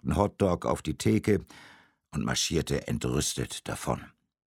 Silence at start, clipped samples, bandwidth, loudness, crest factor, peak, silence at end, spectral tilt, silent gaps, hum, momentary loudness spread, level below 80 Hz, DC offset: 0.05 s; under 0.1%; 17 kHz; -29 LUFS; 22 dB; -8 dBFS; 0.5 s; -5 dB/octave; none; none; 8 LU; -46 dBFS; under 0.1%